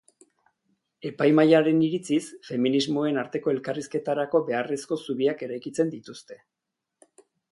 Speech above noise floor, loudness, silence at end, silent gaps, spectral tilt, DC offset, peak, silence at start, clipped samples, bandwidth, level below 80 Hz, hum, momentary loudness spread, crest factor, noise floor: 60 dB; -25 LUFS; 1.15 s; none; -6 dB/octave; under 0.1%; -6 dBFS; 1.05 s; under 0.1%; 11.5 kHz; -74 dBFS; none; 14 LU; 20 dB; -85 dBFS